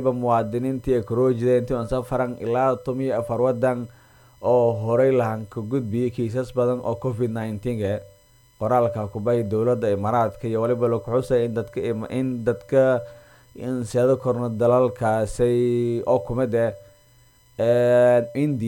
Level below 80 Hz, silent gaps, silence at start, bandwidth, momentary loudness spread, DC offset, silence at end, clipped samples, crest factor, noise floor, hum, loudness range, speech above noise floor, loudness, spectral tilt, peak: -48 dBFS; none; 0 s; 17 kHz; 8 LU; under 0.1%; 0 s; under 0.1%; 16 dB; -55 dBFS; none; 3 LU; 34 dB; -22 LUFS; -8 dB/octave; -6 dBFS